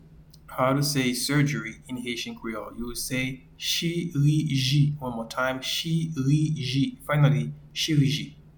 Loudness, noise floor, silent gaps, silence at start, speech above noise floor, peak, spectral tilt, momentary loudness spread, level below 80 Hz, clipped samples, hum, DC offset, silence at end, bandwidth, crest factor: -26 LUFS; -50 dBFS; none; 0.1 s; 24 dB; -8 dBFS; -5 dB/octave; 10 LU; -52 dBFS; under 0.1%; none; under 0.1%; 0.15 s; 19 kHz; 18 dB